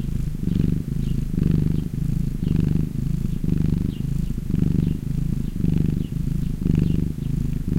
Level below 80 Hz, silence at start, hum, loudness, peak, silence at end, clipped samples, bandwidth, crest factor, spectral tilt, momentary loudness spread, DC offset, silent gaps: -28 dBFS; 0 s; none; -24 LUFS; -4 dBFS; 0 s; under 0.1%; 16 kHz; 18 dB; -9 dB/octave; 5 LU; under 0.1%; none